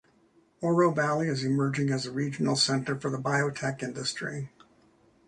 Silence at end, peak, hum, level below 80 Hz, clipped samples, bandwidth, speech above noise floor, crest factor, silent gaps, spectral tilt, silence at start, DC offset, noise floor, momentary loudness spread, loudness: 0.8 s; -10 dBFS; none; -66 dBFS; under 0.1%; 11 kHz; 36 dB; 18 dB; none; -5 dB/octave; 0.6 s; under 0.1%; -64 dBFS; 9 LU; -28 LUFS